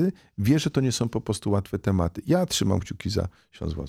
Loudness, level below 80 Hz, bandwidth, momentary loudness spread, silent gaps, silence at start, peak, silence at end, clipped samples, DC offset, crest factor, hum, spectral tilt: -26 LUFS; -44 dBFS; 16 kHz; 7 LU; none; 0 s; -10 dBFS; 0 s; under 0.1%; under 0.1%; 16 dB; none; -5.5 dB/octave